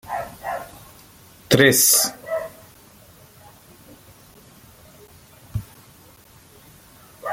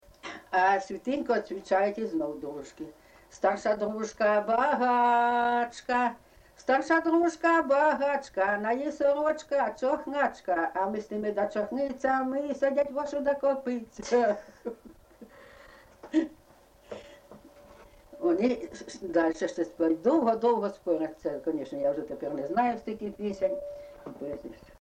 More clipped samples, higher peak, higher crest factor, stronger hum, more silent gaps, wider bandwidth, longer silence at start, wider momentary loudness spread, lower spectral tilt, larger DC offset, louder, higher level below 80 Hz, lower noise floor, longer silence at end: neither; first, -2 dBFS vs -14 dBFS; first, 24 dB vs 16 dB; neither; neither; first, 17 kHz vs 9.6 kHz; second, 0.05 s vs 0.25 s; first, 21 LU vs 15 LU; second, -2.5 dB/octave vs -5 dB/octave; neither; first, -19 LUFS vs -28 LUFS; first, -52 dBFS vs -64 dBFS; second, -49 dBFS vs -58 dBFS; second, 0 s vs 0.25 s